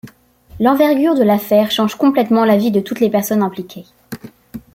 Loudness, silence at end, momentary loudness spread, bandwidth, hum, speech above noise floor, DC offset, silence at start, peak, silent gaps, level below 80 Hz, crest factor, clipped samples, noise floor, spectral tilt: -14 LUFS; 0.15 s; 20 LU; 16.5 kHz; none; 30 dB; under 0.1%; 0.05 s; -2 dBFS; none; -52 dBFS; 14 dB; under 0.1%; -43 dBFS; -6 dB/octave